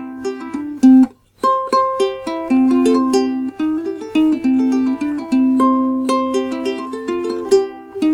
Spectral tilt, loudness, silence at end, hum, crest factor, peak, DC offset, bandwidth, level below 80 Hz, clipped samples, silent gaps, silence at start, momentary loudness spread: -5 dB/octave; -17 LUFS; 0 s; none; 14 dB; -2 dBFS; under 0.1%; 11 kHz; -56 dBFS; under 0.1%; none; 0 s; 10 LU